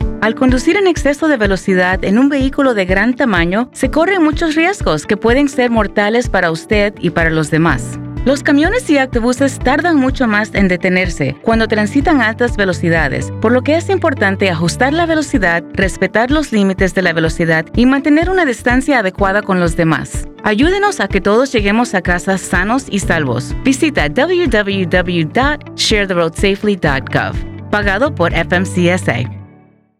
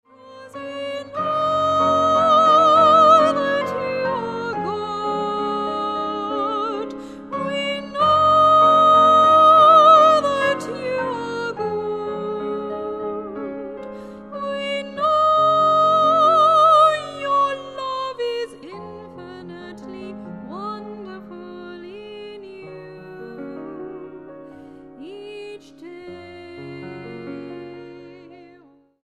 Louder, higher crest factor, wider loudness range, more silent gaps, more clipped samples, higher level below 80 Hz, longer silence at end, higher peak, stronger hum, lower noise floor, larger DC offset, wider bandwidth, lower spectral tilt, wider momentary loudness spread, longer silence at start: first, -13 LUFS vs -17 LUFS; second, 12 dB vs 18 dB; second, 1 LU vs 23 LU; neither; neither; first, -26 dBFS vs -62 dBFS; second, 0.55 s vs 0.7 s; about the same, 0 dBFS vs -2 dBFS; neither; second, -45 dBFS vs -52 dBFS; neither; first, 14 kHz vs 10 kHz; about the same, -5.5 dB/octave vs -5 dB/octave; second, 4 LU vs 25 LU; second, 0 s vs 0.25 s